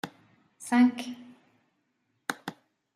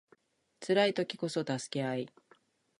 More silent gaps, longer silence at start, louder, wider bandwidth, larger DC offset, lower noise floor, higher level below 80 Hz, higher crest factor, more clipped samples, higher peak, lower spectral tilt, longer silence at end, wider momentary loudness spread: neither; second, 0.05 s vs 0.6 s; first, -28 LUFS vs -33 LUFS; first, 14.5 kHz vs 11.5 kHz; neither; first, -76 dBFS vs -68 dBFS; about the same, -82 dBFS vs -82 dBFS; about the same, 20 dB vs 20 dB; neither; about the same, -12 dBFS vs -14 dBFS; about the same, -4 dB/octave vs -5 dB/octave; second, 0.45 s vs 0.7 s; first, 21 LU vs 13 LU